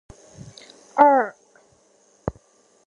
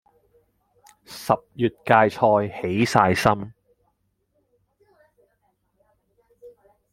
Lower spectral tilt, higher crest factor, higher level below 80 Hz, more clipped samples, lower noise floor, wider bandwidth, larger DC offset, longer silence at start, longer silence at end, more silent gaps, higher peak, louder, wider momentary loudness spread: about the same, -6.5 dB/octave vs -6 dB/octave; about the same, 24 dB vs 24 dB; first, -52 dBFS vs -58 dBFS; neither; second, -59 dBFS vs -71 dBFS; second, 10 kHz vs 16.5 kHz; neither; second, 0.95 s vs 1.1 s; about the same, 0.55 s vs 0.45 s; neither; about the same, 0 dBFS vs 0 dBFS; about the same, -21 LUFS vs -21 LUFS; first, 27 LU vs 13 LU